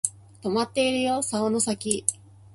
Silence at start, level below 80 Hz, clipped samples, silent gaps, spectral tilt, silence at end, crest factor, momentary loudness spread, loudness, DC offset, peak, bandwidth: 0.05 s; -60 dBFS; under 0.1%; none; -3 dB/octave; 0.4 s; 24 dB; 6 LU; -25 LUFS; under 0.1%; -2 dBFS; 12 kHz